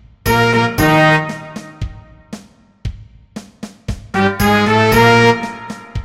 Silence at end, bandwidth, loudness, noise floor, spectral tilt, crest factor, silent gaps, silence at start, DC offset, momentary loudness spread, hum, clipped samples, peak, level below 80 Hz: 0 s; 17 kHz; -12 LUFS; -42 dBFS; -5.5 dB/octave; 16 dB; none; 0.25 s; under 0.1%; 25 LU; none; under 0.1%; 0 dBFS; -32 dBFS